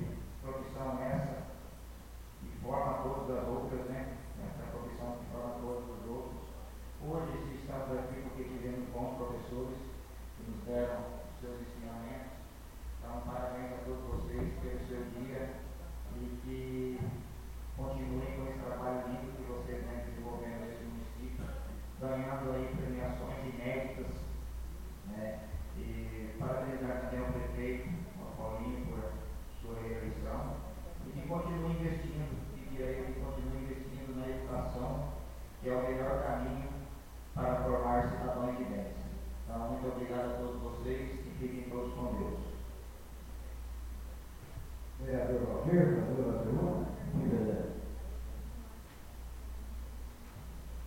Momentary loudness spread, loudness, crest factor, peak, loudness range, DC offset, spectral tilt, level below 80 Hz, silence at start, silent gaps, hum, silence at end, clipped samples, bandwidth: 13 LU; -40 LUFS; 22 dB; -16 dBFS; 7 LU; under 0.1%; -7.5 dB/octave; -46 dBFS; 0 s; none; none; 0 s; under 0.1%; 16.5 kHz